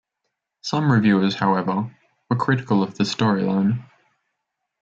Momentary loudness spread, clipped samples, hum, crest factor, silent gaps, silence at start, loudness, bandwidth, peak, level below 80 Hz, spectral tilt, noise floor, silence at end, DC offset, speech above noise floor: 9 LU; under 0.1%; none; 16 dB; none; 0.65 s; -21 LUFS; 7.6 kHz; -6 dBFS; -64 dBFS; -6.5 dB/octave; -79 dBFS; 1 s; under 0.1%; 59 dB